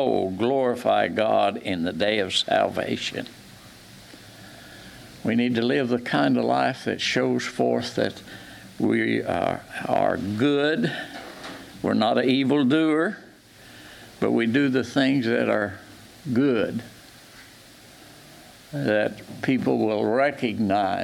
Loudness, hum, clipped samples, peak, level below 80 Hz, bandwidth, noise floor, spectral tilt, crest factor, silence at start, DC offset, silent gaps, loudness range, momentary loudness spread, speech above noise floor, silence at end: -23 LUFS; none; under 0.1%; -6 dBFS; -62 dBFS; 15.5 kHz; -49 dBFS; -5.5 dB/octave; 18 dB; 0 s; under 0.1%; none; 5 LU; 20 LU; 26 dB; 0 s